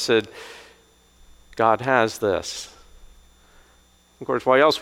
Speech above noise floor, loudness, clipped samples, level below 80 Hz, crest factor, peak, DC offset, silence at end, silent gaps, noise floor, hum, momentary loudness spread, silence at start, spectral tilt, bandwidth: 36 dB; -21 LUFS; under 0.1%; -54 dBFS; 22 dB; -2 dBFS; under 0.1%; 0 s; none; -57 dBFS; 60 Hz at -60 dBFS; 23 LU; 0 s; -4 dB/octave; 16 kHz